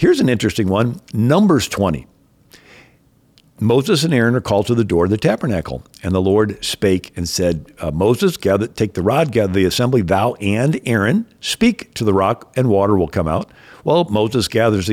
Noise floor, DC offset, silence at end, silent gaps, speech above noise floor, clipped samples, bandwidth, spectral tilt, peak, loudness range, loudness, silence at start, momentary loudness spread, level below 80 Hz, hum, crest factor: -54 dBFS; under 0.1%; 0 s; none; 38 dB; under 0.1%; 17 kHz; -6 dB/octave; -4 dBFS; 2 LU; -17 LUFS; 0 s; 7 LU; -44 dBFS; none; 12 dB